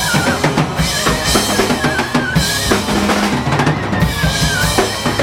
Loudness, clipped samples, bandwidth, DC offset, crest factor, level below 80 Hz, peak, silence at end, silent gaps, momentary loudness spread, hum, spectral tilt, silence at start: -14 LUFS; under 0.1%; 17.5 kHz; under 0.1%; 14 dB; -28 dBFS; 0 dBFS; 0 s; none; 2 LU; none; -4 dB/octave; 0 s